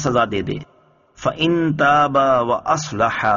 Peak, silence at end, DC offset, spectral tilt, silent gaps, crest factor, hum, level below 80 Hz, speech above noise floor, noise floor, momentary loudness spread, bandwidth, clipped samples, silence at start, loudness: -4 dBFS; 0 s; under 0.1%; -4 dB/octave; none; 14 dB; none; -48 dBFS; 33 dB; -51 dBFS; 10 LU; 7.2 kHz; under 0.1%; 0 s; -18 LUFS